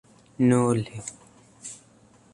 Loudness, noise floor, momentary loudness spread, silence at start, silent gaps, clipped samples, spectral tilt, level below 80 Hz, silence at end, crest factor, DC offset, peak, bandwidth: -23 LUFS; -56 dBFS; 21 LU; 0.4 s; none; under 0.1%; -6.5 dB/octave; -62 dBFS; 0.6 s; 18 dB; under 0.1%; -8 dBFS; 11 kHz